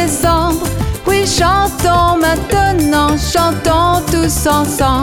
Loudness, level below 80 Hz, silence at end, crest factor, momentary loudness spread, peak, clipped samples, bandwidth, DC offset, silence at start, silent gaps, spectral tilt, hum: -13 LUFS; -24 dBFS; 0 s; 10 dB; 3 LU; -2 dBFS; under 0.1%; 18 kHz; under 0.1%; 0 s; none; -4.5 dB/octave; none